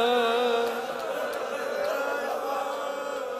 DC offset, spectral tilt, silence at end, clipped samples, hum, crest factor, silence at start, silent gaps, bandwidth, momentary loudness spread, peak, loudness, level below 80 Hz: under 0.1%; -2 dB/octave; 0 s; under 0.1%; none; 14 dB; 0 s; none; 15.5 kHz; 8 LU; -14 dBFS; -28 LUFS; -72 dBFS